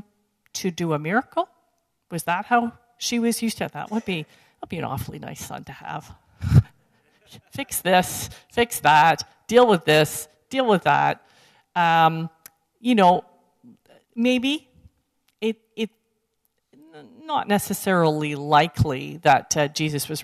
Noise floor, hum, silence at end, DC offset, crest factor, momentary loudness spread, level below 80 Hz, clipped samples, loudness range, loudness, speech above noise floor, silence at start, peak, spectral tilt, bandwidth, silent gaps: -73 dBFS; none; 0 s; under 0.1%; 18 dB; 17 LU; -48 dBFS; under 0.1%; 9 LU; -22 LUFS; 51 dB; 0.55 s; -4 dBFS; -4.5 dB/octave; 14 kHz; none